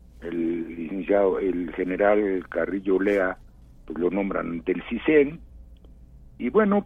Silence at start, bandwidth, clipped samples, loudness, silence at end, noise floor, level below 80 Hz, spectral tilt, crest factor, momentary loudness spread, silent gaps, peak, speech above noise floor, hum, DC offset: 0.2 s; 3.9 kHz; under 0.1%; -25 LUFS; 0 s; -48 dBFS; -48 dBFS; -8.5 dB/octave; 18 dB; 11 LU; none; -6 dBFS; 25 dB; none; under 0.1%